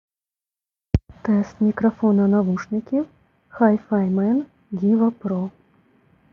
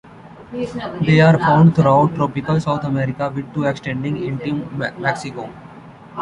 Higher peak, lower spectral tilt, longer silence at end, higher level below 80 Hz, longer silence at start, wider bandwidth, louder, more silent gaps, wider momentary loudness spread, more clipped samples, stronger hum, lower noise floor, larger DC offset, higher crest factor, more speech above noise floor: about the same, -2 dBFS vs -2 dBFS; first, -10 dB/octave vs -8 dB/octave; first, 0.85 s vs 0 s; about the same, -44 dBFS vs -48 dBFS; first, 0.95 s vs 0.05 s; second, 6.4 kHz vs 10 kHz; second, -21 LUFS vs -18 LUFS; neither; second, 8 LU vs 15 LU; neither; neither; first, under -90 dBFS vs -39 dBFS; neither; about the same, 18 dB vs 16 dB; first, over 71 dB vs 22 dB